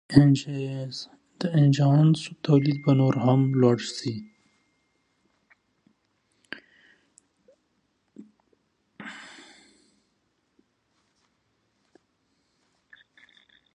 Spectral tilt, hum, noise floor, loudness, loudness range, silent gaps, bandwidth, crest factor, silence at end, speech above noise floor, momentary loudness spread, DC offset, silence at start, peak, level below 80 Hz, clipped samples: -7.5 dB/octave; none; -73 dBFS; -23 LUFS; 24 LU; none; 9.8 kHz; 26 dB; 4.5 s; 51 dB; 23 LU; under 0.1%; 0.1 s; -2 dBFS; -64 dBFS; under 0.1%